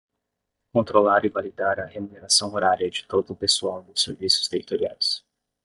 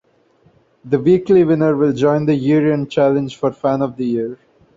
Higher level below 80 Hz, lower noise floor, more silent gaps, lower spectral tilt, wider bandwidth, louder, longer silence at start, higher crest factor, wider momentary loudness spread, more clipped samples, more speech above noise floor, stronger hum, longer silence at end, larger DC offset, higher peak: second, -66 dBFS vs -54 dBFS; first, -81 dBFS vs -55 dBFS; neither; second, -2.5 dB/octave vs -8.5 dB/octave; first, 11.5 kHz vs 7.6 kHz; second, -23 LUFS vs -16 LUFS; about the same, 0.75 s vs 0.85 s; first, 22 dB vs 14 dB; about the same, 8 LU vs 8 LU; neither; first, 57 dB vs 40 dB; neither; about the same, 0.45 s vs 0.4 s; neither; about the same, -2 dBFS vs -2 dBFS